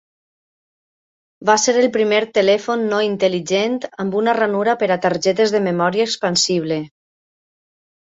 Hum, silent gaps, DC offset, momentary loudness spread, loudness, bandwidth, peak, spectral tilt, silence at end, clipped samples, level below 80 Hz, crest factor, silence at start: none; none; under 0.1%; 7 LU; -17 LUFS; 8 kHz; -2 dBFS; -3.5 dB/octave; 1.15 s; under 0.1%; -64 dBFS; 18 dB; 1.4 s